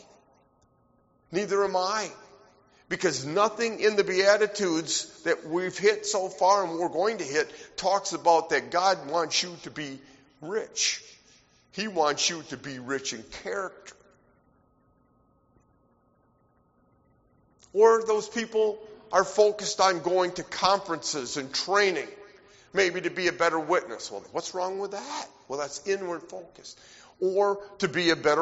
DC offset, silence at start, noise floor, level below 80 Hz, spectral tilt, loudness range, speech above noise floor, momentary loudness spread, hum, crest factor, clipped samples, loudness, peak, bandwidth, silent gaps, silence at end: under 0.1%; 1.3 s; -66 dBFS; -66 dBFS; -1.5 dB/octave; 7 LU; 39 dB; 14 LU; none; 22 dB; under 0.1%; -27 LUFS; -6 dBFS; 8 kHz; none; 0 s